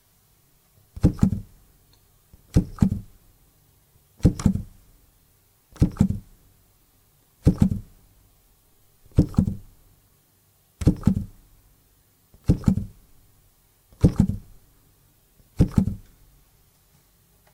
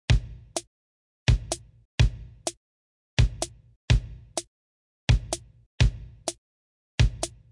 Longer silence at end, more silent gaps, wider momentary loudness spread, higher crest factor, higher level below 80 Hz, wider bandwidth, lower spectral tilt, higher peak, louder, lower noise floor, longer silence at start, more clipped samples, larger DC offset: first, 1.55 s vs 0.25 s; second, none vs 0.67-1.26 s, 1.85-1.98 s, 2.57-3.17 s, 3.76-3.88 s, 4.47-5.07 s, 5.66-5.78 s, 6.38-6.98 s; first, 13 LU vs 10 LU; first, 24 dB vs 18 dB; about the same, -36 dBFS vs -32 dBFS; first, 16 kHz vs 11.5 kHz; first, -8.5 dB/octave vs -4.5 dB/octave; first, -2 dBFS vs -10 dBFS; first, -24 LUFS vs -28 LUFS; second, -62 dBFS vs under -90 dBFS; first, 0.95 s vs 0.1 s; neither; neither